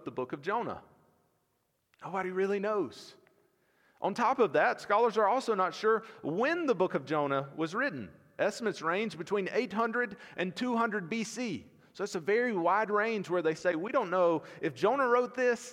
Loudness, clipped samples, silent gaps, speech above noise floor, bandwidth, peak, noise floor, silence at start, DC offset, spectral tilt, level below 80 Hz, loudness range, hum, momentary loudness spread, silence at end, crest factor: -31 LUFS; under 0.1%; none; 47 dB; 13.5 kHz; -14 dBFS; -77 dBFS; 0 s; under 0.1%; -5 dB/octave; -78 dBFS; 6 LU; none; 10 LU; 0 s; 18 dB